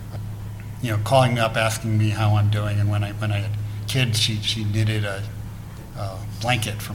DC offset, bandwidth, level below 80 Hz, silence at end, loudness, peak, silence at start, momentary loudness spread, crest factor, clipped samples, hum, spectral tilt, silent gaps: 0.1%; 16 kHz; -42 dBFS; 0 s; -22 LUFS; -4 dBFS; 0 s; 14 LU; 20 dB; under 0.1%; none; -5 dB/octave; none